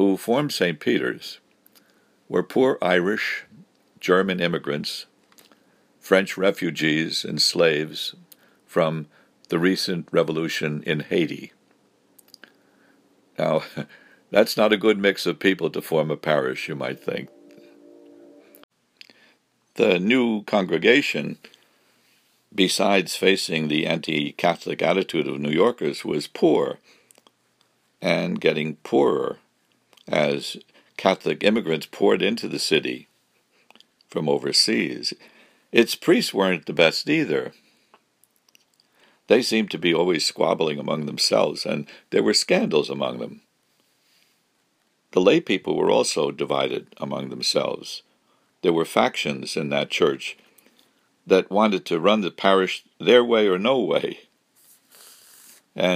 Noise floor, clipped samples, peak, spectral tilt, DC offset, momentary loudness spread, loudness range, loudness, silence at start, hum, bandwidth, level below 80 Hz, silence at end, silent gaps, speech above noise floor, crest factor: -68 dBFS; under 0.1%; 0 dBFS; -4.5 dB/octave; under 0.1%; 12 LU; 4 LU; -22 LUFS; 0 s; none; 15.5 kHz; -70 dBFS; 0 s; 18.64-18.69 s; 46 dB; 24 dB